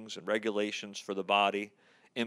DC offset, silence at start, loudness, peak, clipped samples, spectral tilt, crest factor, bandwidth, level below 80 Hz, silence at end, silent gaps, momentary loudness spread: under 0.1%; 0 s; -32 LUFS; -12 dBFS; under 0.1%; -3.5 dB/octave; 22 dB; 13 kHz; under -90 dBFS; 0 s; none; 12 LU